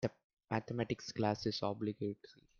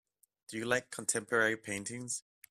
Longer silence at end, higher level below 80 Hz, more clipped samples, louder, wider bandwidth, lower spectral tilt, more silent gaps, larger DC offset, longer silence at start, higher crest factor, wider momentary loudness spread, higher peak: about the same, 0.25 s vs 0.3 s; about the same, -70 dBFS vs -74 dBFS; neither; second, -39 LUFS vs -34 LUFS; second, 7.2 kHz vs 15.5 kHz; first, -6 dB/octave vs -2.5 dB/octave; first, 0.24-0.37 s vs none; neither; second, 0 s vs 0.5 s; about the same, 20 dB vs 22 dB; second, 7 LU vs 10 LU; second, -20 dBFS vs -14 dBFS